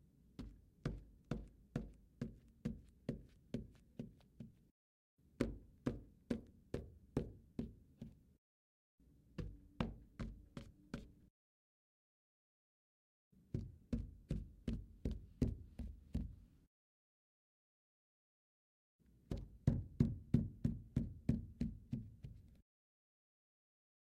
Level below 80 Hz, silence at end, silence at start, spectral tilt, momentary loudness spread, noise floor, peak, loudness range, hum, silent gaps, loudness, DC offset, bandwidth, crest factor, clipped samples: -56 dBFS; 1.5 s; 0.4 s; -8.5 dB/octave; 17 LU; under -90 dBFS; -20 dBFS; 13 LU; none; 4.71-5.17 s, 8.38-8.98 s, 11.30-13.31 s, 16.67-18.99 s; -47 LUFS; under 0.1%; 12.5 kHz; 28 dB; under 0.1%